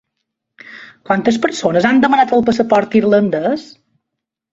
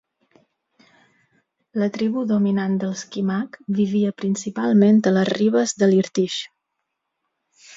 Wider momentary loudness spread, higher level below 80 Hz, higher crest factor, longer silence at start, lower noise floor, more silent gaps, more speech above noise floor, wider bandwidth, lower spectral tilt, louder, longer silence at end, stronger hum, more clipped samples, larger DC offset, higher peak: about the same, 9 LU vs 10 LU; first, -52 dBFS vs -68 dBFS; about the same, 14 dB vs 16 dB; second, 0.7 s vs 1.75 s; about the same, -79 dBFS vs -78 dBFS; neither; first, 66 dB vs 59 dB; about the same, 8 kHz vs 7.8 kHz; about the same, -6 dB/octave vs -6 dB/octave; first, -14 LUFS vs -20 LUFS; first, 0.9 s vs 0 s; neither; neither; neither; first, -2 dBFS vs -6 dBFS